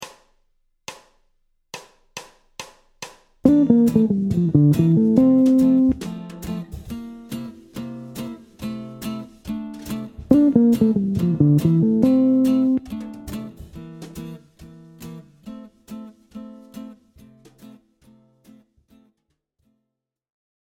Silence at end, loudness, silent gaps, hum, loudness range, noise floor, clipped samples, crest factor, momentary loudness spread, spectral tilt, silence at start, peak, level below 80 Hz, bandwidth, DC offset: 3.7 s; -18 LUFS; none; none; 23 LU; -81 dBFS; under 0.1%; 22 dB; 24 LU; -8.5 dB/octave; 0 s; 0 dBFS; -48 dBFS; 16.5 kHz; under 0.1%